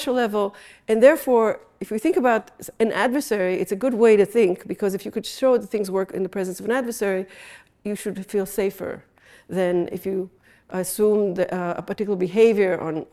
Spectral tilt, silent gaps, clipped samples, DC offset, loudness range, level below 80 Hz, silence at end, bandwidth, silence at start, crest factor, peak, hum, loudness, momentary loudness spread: -5.5 dB/octave; none; under 0.1%; under 0.1%; 7 LU; -60 dBFS; 0.1 s; 15 kHz; 0 s; 20 dB; -2 dBFS; none; -22 LUFS; 14 LU